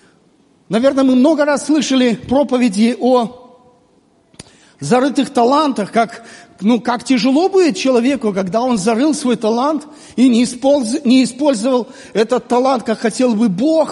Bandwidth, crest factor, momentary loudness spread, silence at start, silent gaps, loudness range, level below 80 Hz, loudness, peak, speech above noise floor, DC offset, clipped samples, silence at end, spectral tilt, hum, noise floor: 11.5 kHz; 14 dB; 6 LU; 0.7 s; none; 3 LU; -56 dBFS; -14 LUFS; -2 dBFS; 40 dB; under 0.1%; under 0.1%; 0 s; -5 dB/octave; none; -54 dBFS